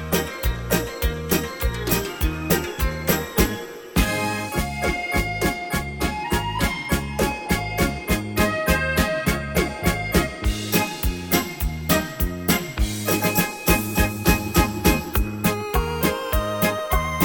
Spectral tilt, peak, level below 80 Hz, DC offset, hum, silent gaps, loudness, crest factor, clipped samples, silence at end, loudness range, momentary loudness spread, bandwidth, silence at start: -4.5 dB/octave; -4 dBFS; -30 dBFS; under 0.1%; none; none; -23 LUFS; 20 dB; under 0.1%; 0 s; 3 LU; 6 LU; 17.5 kHz; 0 s